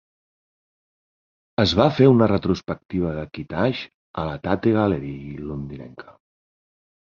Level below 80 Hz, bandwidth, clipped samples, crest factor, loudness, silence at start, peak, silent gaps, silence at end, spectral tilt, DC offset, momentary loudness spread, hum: -44 dBFS; 7.4 kHz; under 0.1%; 22 dB; -21 LUFS; 1.6 s; -2 dBFS; 2.85-2.89 s, 3.94-4.14 s; 0.9 s; -7.5 dB/octave; under 0.1%; 17 LU; none